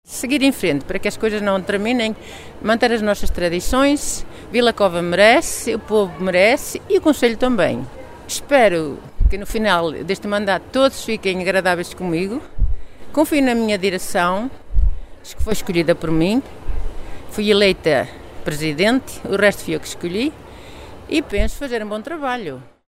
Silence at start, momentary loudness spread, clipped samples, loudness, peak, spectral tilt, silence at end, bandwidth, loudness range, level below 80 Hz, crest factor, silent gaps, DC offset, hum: 0.1 s; 14 LU; under 0.1%; -19 LUFS; 0 dBFS; -4.5 dB/octave; 0.2 s; 16 kHz; 4 LU; -28 dBFS; 18 dB; none; under 0.1%; none